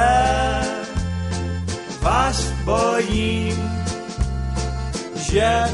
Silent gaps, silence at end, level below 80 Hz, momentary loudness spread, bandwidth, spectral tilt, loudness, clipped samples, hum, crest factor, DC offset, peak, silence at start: none; 0 s; -28 dBFS; 8 LU; 11.5 kHz; -5 dB/octave; -22 LUFS; under 0.1%; none; 16 dB; under 0.1%; -4 dBFS; 0 s